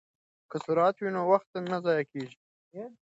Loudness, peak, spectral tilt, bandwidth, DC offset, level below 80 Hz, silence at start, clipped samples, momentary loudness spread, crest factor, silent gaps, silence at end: -29 LUFS; -10 dBFS; -7 dB/octave; 8 kHz; under 0.1%; -80 dBFS; 0.5 s; under 0.1%; 18 LU; 20 dB; 1.47-1.54 s, 2.37-2.71 s; 0.15 s